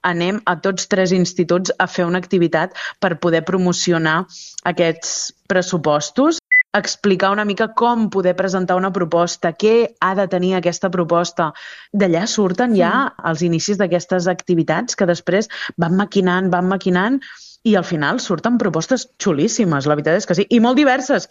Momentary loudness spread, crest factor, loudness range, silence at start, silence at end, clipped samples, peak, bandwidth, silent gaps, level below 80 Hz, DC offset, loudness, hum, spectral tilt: 6 LU; 16 dB; 2 LU; 0.05 s; 0.05 s; under 0.1%; 0 dBFS; 8 kHz; none; -60 dBFS; under 0.1%; -17 LUFS; none; -5 dB/octave